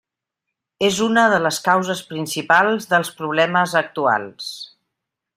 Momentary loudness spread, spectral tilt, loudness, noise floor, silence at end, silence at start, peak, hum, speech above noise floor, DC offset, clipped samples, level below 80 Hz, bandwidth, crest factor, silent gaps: 14 LU; -3.5 dB/octave; -18 LUFS; -82 dBFS; 0.7 s; 0.8 s; -2 dBFS; none; 63 dB; under 0.1%; under 0.1%; -64 dBFS; 16 kHz; 18 dB; none